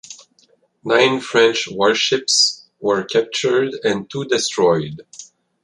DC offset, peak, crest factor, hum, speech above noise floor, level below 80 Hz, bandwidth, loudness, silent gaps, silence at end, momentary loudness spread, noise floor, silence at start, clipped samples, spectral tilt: under 0.1%; -2 dBFS; 18 dB; none; 41 dB; -60 dBFS; 11.5 kHz; -17 LUFS; none; 0.4 s; 13 LU; -58 dBFS; 0.1 s; under 0.1%; -2.5 dB/octave